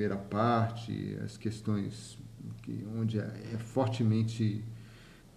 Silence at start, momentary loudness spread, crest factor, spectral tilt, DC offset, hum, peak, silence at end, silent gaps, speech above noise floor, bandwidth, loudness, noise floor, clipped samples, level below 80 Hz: 0 s; 17 LU; 18 dB; -7.5 dB/octave; under 0.1%; none; -16 dBFS; 0 s; none; 21 dB; 11.5 kHz; -34 LUFS; -54 dBFS; under 0.1%; -62 dBFS